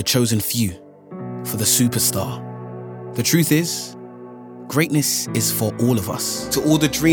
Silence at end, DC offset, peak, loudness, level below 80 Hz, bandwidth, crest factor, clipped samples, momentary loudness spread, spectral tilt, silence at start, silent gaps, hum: 0 s; under 0.1%; 0 dBFS; -19 LUFS; -52 dBFS; over 20 kHz; 20 dB; under 0.1%; 19 LU; -4 dB/octave; 0 s; none; none